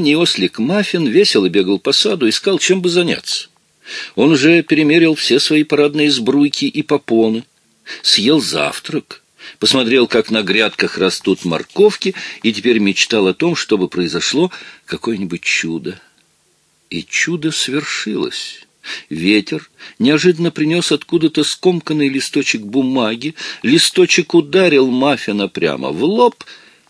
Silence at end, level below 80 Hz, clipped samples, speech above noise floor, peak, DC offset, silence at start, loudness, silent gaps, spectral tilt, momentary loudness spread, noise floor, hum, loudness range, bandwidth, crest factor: 0.35 s; -60 dBFS; under 0.1%; 43 dB; 0 dBFS; under 0.1%; 0 s; -14 LUFS; none; -4 dB/octave; 12 LU; -58 dBFS; none; 6 LU; 11 kHz; 14 dB